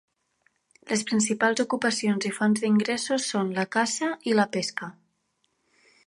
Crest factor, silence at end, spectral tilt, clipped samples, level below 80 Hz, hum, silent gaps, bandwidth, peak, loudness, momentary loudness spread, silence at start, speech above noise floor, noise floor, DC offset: 20 dB; 1.15 s; -4 dB/octave; under 0.1%; -74 dBFS; none; none; 11.5 kHz; -8 dBFS; -25 LUFS; 6 LU; 0.85 s; 48 dB; -73 dBFS; under 0.1%